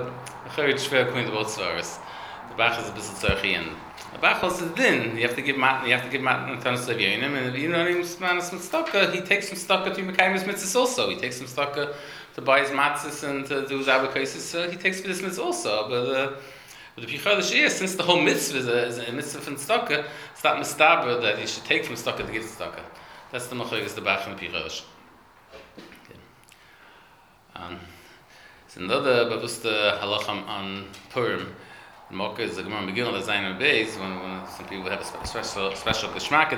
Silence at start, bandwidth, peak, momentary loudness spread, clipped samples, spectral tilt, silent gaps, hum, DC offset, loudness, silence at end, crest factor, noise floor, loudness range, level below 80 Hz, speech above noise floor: 0 s; over 20 kHz; -2 dBFS; 15 LU; under 0.1%; -3 dB/octave; none; none; under 0.1%; -24 LUFS; 0 s; 24 dB; -55 dBFS; 8 LU; -54 dBFS; 29 dB